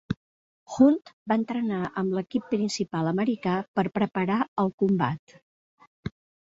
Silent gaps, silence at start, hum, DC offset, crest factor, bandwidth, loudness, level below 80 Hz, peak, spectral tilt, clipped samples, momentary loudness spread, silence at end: 0.17-0.66 s, 1.13-1.26 s, 3.68-3.74 s, 4.48-4.56 s, 4.73-4.78 s, 5.19-5.27 s, 5.42-5.78 s, 5.87-6.03 s; 0.1 s; none; under 0.1%; 20 dB; 8 kHz; -26 LUFS; -60 dBFS; -8 dBFS; -6.5 dB/octave; under 0.1%; 16 LU; 0.4 s